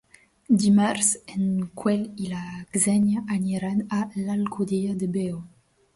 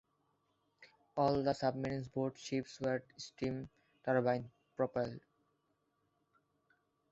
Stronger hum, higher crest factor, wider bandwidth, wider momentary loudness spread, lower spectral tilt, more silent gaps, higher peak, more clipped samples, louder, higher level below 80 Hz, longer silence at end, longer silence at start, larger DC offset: neither; about the same, 18 dB vs 20 dB; first, 11.5 kHz vs 8 kHz; about the same, 11 LU vs 12 LU; about the same, -5 dB/octave vs -5.5 dB/octave; neither; first, -6 dBFS vs -20 dBFS; neither; first, -24 LUFS vs -38 LUFS; first, -60 dBFS vs -70 dBFS; second, 0.5 s vs 1.9 s; second, 0.5 s vs 0.8 s; neither